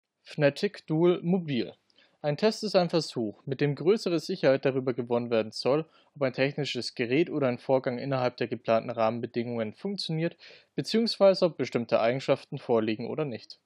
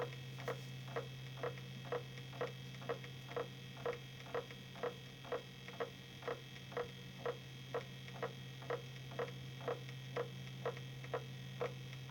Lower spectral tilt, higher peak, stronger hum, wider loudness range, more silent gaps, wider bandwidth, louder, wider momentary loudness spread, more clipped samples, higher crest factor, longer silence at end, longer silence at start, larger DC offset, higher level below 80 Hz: about the same, -6 dB/octave vs -5.5 dB/octave; first, -10 dBFS vs -28 dBFS; neither; about the same, 2 LU vs 1 LU; neither; second, 11.5 kHz vs over 20 kHz; first, -28 LUFS vs -47 LUFS; first, 8 LU vs 4 LU; neither; about the same, 18 dB vs 18 dB; about the same, 0.1 s vs 0 s; first, 0.25 s vs 0 s; neither; second, -82 dBFS vs -72 dBFS